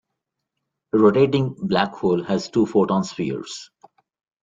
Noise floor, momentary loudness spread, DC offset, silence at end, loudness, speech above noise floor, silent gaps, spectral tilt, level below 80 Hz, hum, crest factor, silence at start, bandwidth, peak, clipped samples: -81 dBFS; 11 LU; under 0.1%; 0.8 s; -20 LUFS; 61 dB; none; -6.5 dB/octave; -60 dBFS; none; 20 dB; 0.95 s; 7.8 kHz; -2 dBFS; under 0.1%